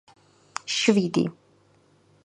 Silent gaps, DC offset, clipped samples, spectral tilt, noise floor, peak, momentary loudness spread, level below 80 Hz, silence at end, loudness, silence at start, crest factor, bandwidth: none; under 0.1%; under 0.1%; -4.5 dB/octave; -61 dBFS; -6 dBFS; 16 LU; -70 dBFS; 0.95 s; -24 LUFS; 0.65 s; 22 dB; 11 kHz